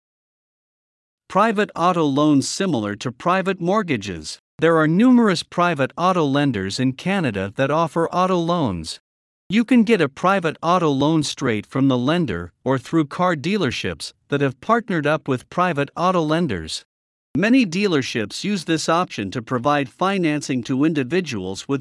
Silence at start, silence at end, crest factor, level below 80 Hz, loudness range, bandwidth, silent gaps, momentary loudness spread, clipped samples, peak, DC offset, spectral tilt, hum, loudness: 1.3 s; 0 s; 16 dB; -58 dBFS; 3 LU; 12 kHz; 4.39-4.58 s, 9.00-9.50 s, 16.85-17.34 s; 9 LU; under 0.1%; -4 dBFS; under 0.1%; -5.5 dB/octave; none; -20 LUFS